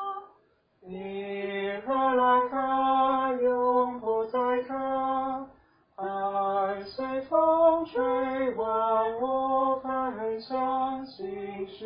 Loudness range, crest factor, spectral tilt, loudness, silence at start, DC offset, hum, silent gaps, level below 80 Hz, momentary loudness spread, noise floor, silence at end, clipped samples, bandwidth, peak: 4 LU; 16 dB; -9 dB/octave; -27 LUFS; 0 s; under 0.1%; none; none; -64 dBFS; 13 LU; -66 dBFS; 0 s; under 0.1%; 5.2 kHz; -12 dBFS